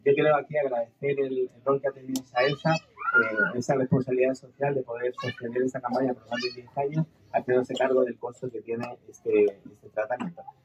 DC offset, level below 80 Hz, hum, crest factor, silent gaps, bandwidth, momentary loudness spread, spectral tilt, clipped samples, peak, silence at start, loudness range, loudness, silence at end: under 0.1%; -72 dBFS; none; 16 dB; none; 14 kHz; 10 LU; -6 dB/octave; under 0.1%; -10 dBFS; 0.05 s; 3 LU; -27 LUFS; 0.15 s